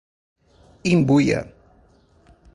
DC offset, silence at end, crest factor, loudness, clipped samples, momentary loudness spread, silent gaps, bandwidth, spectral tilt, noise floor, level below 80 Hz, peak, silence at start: under 0.1%; 1.05 s; 18 dB; -19 LUFS; under 0.1%; 13 LU; none; 11 kHz; -7 dB/octave; -56 dBFS; -50 dBFS; -6 dBFS; 0.85 s